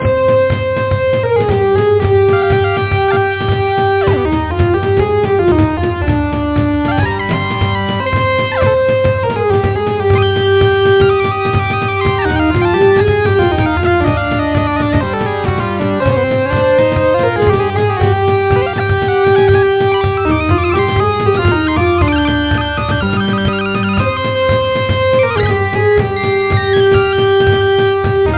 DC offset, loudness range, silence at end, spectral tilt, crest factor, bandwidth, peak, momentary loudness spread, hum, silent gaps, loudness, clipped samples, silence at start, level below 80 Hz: under 0.1%; 2 LU; 0 s; -10.5 dB/octave; 12 dB; 4 kHz; 0 dBFS; 4 LU; none; none; -13 LUFS; under 0.1%; 0 s; -26 dBFS